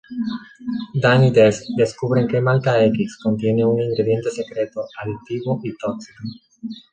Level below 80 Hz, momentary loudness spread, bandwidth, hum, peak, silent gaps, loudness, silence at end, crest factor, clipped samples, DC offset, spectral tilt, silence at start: -54 dBFS; 16 LU; 9 kHz; none; -2 dBFS; none; -19 LUFS; 0.15 s; 18 dB; under 0.1%; under 0.1%; -7 dB/octave; 0.1 s